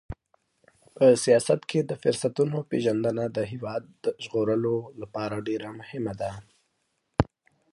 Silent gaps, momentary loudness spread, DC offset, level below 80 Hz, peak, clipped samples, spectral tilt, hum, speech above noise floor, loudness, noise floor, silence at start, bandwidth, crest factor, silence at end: none; 13 LU; under 0.1%; -50 dBFS; -2 dBFS; under 0.1%; -6 dB/octave; none; 50 dB; -27 LUFS; -75 dBFS; 0.1 s; 11.5 kHz; 26 dB; 0.5 s